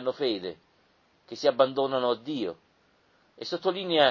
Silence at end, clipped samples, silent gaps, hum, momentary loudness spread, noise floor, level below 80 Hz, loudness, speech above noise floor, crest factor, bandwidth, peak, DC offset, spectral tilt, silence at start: 0 s; under 0.1%; none; none; 16 LU; -65 dBFS; -72 dBFS; -28 LUFS; 39 dB; 22 dB; 7.2 kHz; -6 dBFS; under 0.1%; -5 dB/octave; 0 s